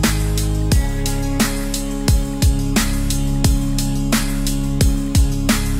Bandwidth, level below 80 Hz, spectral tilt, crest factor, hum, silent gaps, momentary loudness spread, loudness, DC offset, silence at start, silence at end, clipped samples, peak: 16.5 kHz; -20 dBFS; -4.5 dB/octave; 16 dB; none; none; 4 LU; -19 LUFS; under 0.1%; 0 s; 0 s; under 0.1%; -2 dBFS